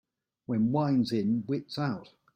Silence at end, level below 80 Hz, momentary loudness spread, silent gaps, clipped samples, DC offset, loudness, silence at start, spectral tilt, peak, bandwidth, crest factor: 0.3 s; -66 dBFS; 9 LU; none; under 0.1%; under 0.1%; -29 LUFS; 0.5 s; -8 dB/octave; -16 dBFS; 15.5 kHz; 14 dB